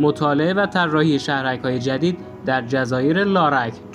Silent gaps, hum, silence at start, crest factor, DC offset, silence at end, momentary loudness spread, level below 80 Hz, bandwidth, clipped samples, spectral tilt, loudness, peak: none; none; 0 s; 16 dB; under 0.1%; 0 s; 6 LU; -56 dBFS; 10.5 kHz; under 0.1%; -6.5 dB/octave; -19 LUFS; -4 dBFS